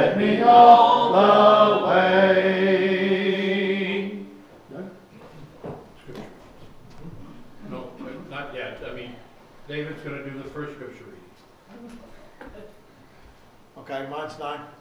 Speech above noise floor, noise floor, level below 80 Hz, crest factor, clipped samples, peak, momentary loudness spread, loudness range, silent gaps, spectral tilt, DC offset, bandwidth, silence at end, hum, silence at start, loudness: 36 dB; -51 dBFS; -54 dBFS; 20 dB; under 0.1%; -2 dBFS; 26 LU; 25 LU; none; -6.5 dB/octave; under 0.1%; 7.4 kHz; 0.15 s; none; 0 s; -17 LUFS